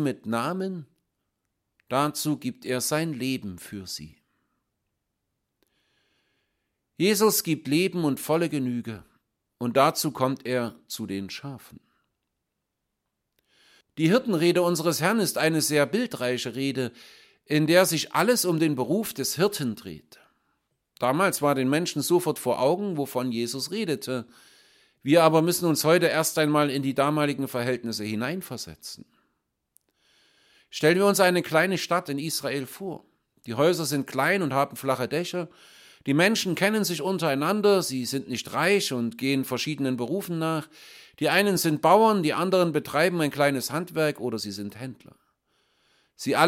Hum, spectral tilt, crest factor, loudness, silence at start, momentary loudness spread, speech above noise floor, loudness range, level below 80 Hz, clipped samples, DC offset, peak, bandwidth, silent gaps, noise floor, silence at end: none; -4.5 dB/octave; 22 dB; -25 LUFS; 0 s; 14 LU; 57 dB; 8 LU; -70 dBFS; under 0.1%; under 0.1%; -4 dBFS; 16.5 kHz; none; -81 dBFS; 0 s